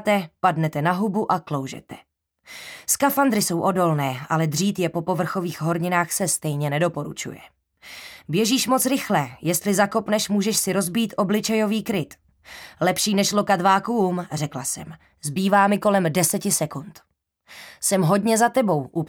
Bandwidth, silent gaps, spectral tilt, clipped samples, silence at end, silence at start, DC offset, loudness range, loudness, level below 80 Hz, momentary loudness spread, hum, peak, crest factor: 19.5 kHz; none; -4.5 dB/octave; under 0.1%; 0 s; 0 s; under 0.1%; 3 LU; -22 LUFS; -62 dBFS; 14 LU; none; -4 dBFS; 18 dB